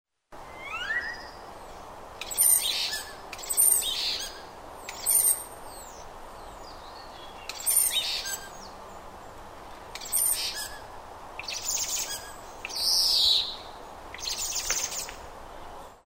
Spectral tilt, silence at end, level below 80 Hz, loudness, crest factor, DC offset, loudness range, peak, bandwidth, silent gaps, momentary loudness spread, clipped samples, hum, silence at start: 1.5 dB/octave; 0.05 s; -52 dBFS; -25 LUFS; 22 dB; under 0.1%; 5 LU; -8 dBFS; 16.5 kHz; none; 24 LU; under 0.1%; none; 0.3 s